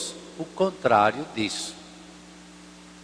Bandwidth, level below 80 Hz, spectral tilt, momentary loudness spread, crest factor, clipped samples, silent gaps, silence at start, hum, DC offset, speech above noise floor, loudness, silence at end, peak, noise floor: 13.5 kHz; -62 dBFS; -4 dB/octave; 26 LU; 22 dB; under 0.1%; none; 0 s; 60 Hz at -50 dBFS; under 0.1%; 23 dB; -25 LUFS; 0 s; -6 dBFS; -47 dBFS